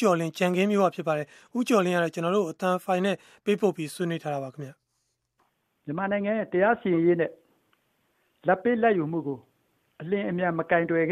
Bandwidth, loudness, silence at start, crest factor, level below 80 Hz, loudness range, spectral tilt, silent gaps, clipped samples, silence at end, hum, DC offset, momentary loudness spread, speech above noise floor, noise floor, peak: 14.5 kHz; -26 LUFS; 0 s; 18 dB; -70 dBFS; 5 LU; -6.5 dB/octave; none; under 0.1%; 0 s; none; under 0.1%; 11 LU; 51 dB; -77 dBFS; -8 dBFS